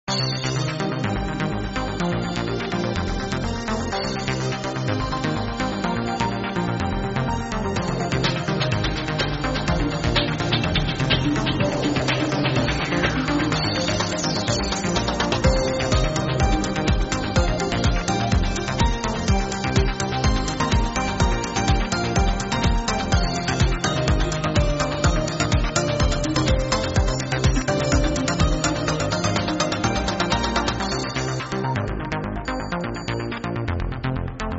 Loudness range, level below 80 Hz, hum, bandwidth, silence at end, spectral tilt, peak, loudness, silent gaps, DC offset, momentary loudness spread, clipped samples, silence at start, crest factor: 4 LU; -28 dBFS; none; 8 kHz; 0 s; -4.5 dB/octave; -4 dBFS; -23 LUFS; none; under 0.1%; 5 LU; under 0.1%; 0.05 s; 18 dB